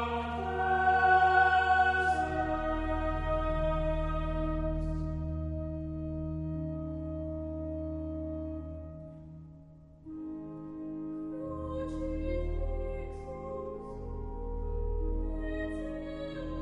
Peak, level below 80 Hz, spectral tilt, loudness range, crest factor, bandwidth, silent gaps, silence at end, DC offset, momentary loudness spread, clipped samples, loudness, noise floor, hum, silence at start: -12 dBFS; -40 dBFS; -7.5 dB/octave; 14 LU; 20 dB; 10 kHz; none; 0 s; under 0.1%; 17 LU; under 0.1%; -33 LUFS; -53 dBFS; none; 0 s